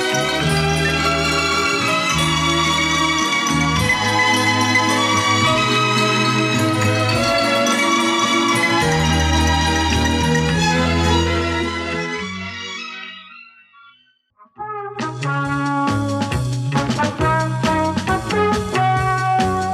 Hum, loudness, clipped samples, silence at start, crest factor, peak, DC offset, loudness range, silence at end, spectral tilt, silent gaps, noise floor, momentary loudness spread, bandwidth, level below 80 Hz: none; -17 LUFS; under 0.1%; 0 s; 14 dB; -4 dBFS; under 0.1%; 9 LU; 0 s; -4 dB/octave; none; -56 dBFS; 9 LU; 15.5 kHz; -36 dBFS